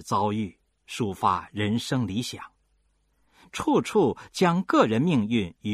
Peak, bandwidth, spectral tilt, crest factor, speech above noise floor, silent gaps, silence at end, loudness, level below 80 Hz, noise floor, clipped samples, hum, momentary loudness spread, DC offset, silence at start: -6 dBFS; 15 kHz; -6 dB/octave; 20 dB; 44 dB; none; 0 s; -25 LUFS; -60 dBFS; -69 dBFS; under 0.1%; none; 12 LU; under 0.1%; 0 s